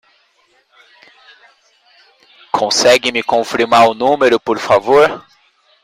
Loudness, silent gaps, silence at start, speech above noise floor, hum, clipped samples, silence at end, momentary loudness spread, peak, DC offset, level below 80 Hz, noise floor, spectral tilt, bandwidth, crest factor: -12 LUFS; none; 2.55 s; 44 dB; none; under 0.1%; 0.65 s; 6 LU; 0 dBFS; under 0.1%; -56 dBFS; -57 dBFS; -2.5 dB/octave; 16 kHz; 16 dB